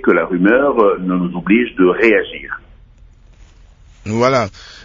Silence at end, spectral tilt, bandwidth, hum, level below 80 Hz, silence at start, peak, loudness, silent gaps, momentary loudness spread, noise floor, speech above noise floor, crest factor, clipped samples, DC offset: 0 s; -6.5 dB/octave; 7.6 kHz; none; -44 dBFS; 0.05 s; 0 dBFS; -14 LUFS; none; 15 LU; -44 dBFS; 30 dB; 16 dB; under 0.1%; under 0.1%